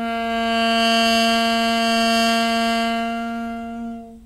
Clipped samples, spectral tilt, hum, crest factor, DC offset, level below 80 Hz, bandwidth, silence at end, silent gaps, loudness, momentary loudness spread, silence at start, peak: under 0.1%; -3 dB/octave; none; 12 dB; under 0.1%; -48 dBFS; 16 kHz; 0 s; none; -18 LUFS; 13 LU; 0 s; -8 dBFS